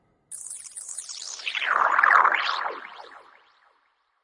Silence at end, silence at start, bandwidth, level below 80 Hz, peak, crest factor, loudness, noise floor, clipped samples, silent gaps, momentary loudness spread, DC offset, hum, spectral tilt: 1.05 s; 0.3 s; 11.5 kHz; -78 dBFS; -6 dBFS; 22 dB; -22 LUFS; -69 dBFS; under 0.1%; none; 22 LU; under 0.1%; none; 2 dB/octave